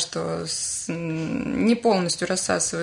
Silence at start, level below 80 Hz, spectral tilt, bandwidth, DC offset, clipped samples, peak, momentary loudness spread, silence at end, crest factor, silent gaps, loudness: 0 s; -56 dBFS; -3.5 dB/octave; 11 kHz; under 0.1%; under 0.1%; -8 dBFS; 7 LU; 0 s; 16 dB; none; -24 LUFS